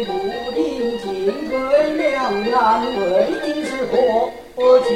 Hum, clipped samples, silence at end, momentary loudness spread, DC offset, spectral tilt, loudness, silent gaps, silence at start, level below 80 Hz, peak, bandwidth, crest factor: none; under 0.1%; 0 s; 7 LU; under 0.1%; -5 dB/octave; -19 LUFS; none; 0 s; -48 dBFS; -2 dBFS; 13.5 kHz; 16 dB